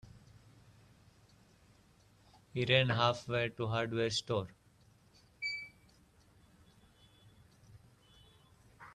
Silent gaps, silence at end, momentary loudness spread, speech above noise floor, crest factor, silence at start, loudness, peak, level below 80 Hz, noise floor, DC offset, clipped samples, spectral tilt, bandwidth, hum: none; 0 s; 16 LU; 33 dB; 26 dB; 0.05 s; -34 LUFS; -14 dBFS; -68 dBFS; -66 dBFS; under 0.1%; under 0.1%; -5 dB/octave; 12 kHz; none